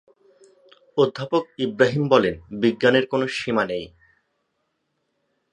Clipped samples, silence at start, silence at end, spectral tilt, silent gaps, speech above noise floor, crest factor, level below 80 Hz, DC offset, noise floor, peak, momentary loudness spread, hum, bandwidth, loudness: under 0.1%; 0.95 s; 1.65 s; -6 dB/octave; none; 53 dB; 22 dB; -58 dBFS; under 0.1%; -74 dBFS; -2 dBFS; 10 LU; none; 10.5 kHz; -22 LUFS